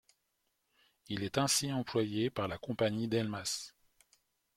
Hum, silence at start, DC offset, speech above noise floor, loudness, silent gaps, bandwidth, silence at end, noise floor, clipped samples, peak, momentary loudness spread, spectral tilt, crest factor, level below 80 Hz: none; 1.1 s; under 0.1%; 47 dB; -34 LUFS; none; 16.5 kHz; 0.85 s; -81 dBFS; under 0.1%; -14 dBFS; 10 LU; -4 dB/octave; 22 dB; -68 dBFS